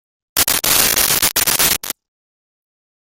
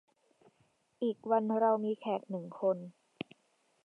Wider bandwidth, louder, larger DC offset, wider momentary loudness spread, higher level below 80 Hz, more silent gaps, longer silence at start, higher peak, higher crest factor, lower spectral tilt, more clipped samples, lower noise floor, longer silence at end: first, over 20 kHz vs 4.4 kHz; first, -13 LUFS vs -33 LUFS; neither; second, 10 LU vs 18 LU; first, -42 dBFS vs -88 dBFS; neither; second, 0.35 s vs 1 s; first, 0 dBFS vs -18 dBFS; about the same, 18 dB vs 18 dB; second, 0 dB/octave vs -8.5 dB/octave; neither; first, under -90 dBFS vs -74 dBFS; first, 1.2 s vs 0.95 s